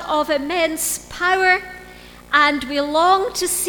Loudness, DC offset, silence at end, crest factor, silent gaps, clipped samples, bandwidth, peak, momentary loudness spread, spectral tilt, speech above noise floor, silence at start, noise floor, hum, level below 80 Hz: -18 LUFS; under 0.1%; 0 s; 18 dB; none; under 0.1%; 19.5 kHz; 0 dBFS; 6 LU; -1 dB/octave; 22 dB; 0 s; -41 dBFS; 60 Hz at -50 dBFS; -48 dBFS